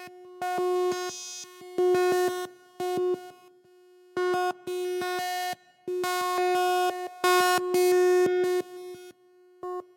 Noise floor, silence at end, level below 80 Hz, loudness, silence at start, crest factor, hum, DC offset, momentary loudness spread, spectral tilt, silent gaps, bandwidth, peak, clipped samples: -58 dBFS; 0.15 s; -78 dBFS; -27 LUFS; 0 s; 16 dB; none; under 0.1%; 16 LU; -3 dB/octave; none; 17 kHz; -12 dBFS; under 0.1%